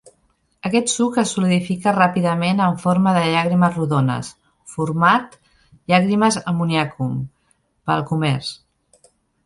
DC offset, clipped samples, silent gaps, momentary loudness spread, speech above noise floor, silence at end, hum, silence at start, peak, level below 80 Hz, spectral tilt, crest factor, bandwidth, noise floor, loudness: under 0.1%; under 0.1%; none; 13 LU; 46 dB; 0.9 s; none; 0.65 s; -2 dBFS; -56 dBFS; -5.5 dB/octave; 18 dB; 11.5 kHz; -64 dBFS; -19 LUFS